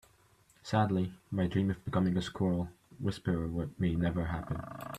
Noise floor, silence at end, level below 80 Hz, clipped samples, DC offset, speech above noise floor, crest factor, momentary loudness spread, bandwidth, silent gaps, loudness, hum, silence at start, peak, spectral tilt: -66 dBFS; 0 s; -54 dBFS; under 0.1%; under 0.1%; 33 dB; 18 dB; 7 LU; 14 kHz; none; -34 LUFS; none; 0.65 s; -16 dBFS; -7.5 dB/octave